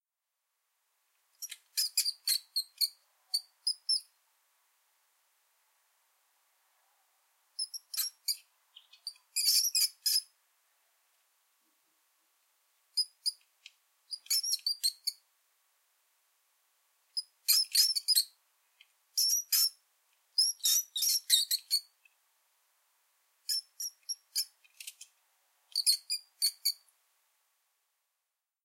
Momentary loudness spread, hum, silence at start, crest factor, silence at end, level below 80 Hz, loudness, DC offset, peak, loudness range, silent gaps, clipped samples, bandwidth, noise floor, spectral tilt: 16 LU; none; 1.4 s; 26 dB; 1.9 s; under -90 dBFS; -30 LUFS; under 0.1%; -10 dBFS; 11 LU; none; under 0.1%; 16 kHz; -87 dBFS; 10.5 dB/octave